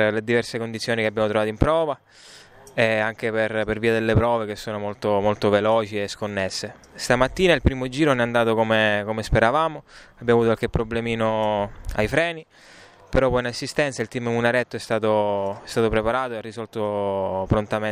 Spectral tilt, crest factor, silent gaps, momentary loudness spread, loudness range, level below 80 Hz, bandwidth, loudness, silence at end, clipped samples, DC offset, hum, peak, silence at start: -5.5 dB/octave; 20 dB; none; 9 LU; 3 LU; -38 dBFS; 15 kHz; -22 LUFS; 0 s; under 0.1%; under 0.1%; none; -2 dBFS; 0 s